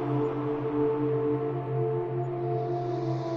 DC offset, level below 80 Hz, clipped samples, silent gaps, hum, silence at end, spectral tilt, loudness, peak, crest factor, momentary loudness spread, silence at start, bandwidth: under 0.1%; -62 dBFS; under 0.1%; none; none; 0 s; -10 dB/octave; -29 LUFS; -16 dBFS; 12 dB; 3 LU; 0 s; 6.2 kHz